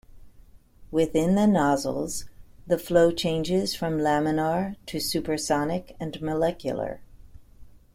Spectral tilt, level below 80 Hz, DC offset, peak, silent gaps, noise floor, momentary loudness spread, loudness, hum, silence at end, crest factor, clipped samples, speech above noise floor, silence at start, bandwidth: -5.5 dB/octave; -50 dBFS; under 0.1%; -8 dBFS; none; -51 dBFS; 11 LU; -25 LUFS; none; 0.15 s; 18 dB; under 0.1%; 27 dB; 0.15 s; 16.5 kHz